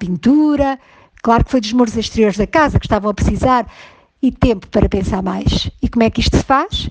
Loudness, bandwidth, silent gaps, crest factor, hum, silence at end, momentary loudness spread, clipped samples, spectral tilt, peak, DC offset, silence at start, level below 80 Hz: -15 LUFS; 9.4 kHz; none; 14 dB; none; 0 s; 6 LU; under 0.1%; -6 dB/octave; 0 dBFS; under 0.1%; 0 s; -26 dBFS